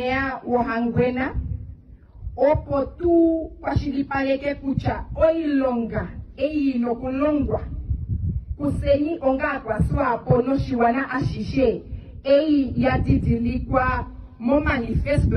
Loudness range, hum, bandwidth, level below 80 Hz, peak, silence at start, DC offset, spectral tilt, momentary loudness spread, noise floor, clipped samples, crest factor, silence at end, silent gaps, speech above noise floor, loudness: 2 LU; none; 9.8 kHz; -34 dBFS; -6 dBFS; 0 s; under 0.1%; -9 dB/octave; 9 LU; -44 dBFS; under 0.1%; 16 dB; 0 s; none; 23 dB; -22 LUFS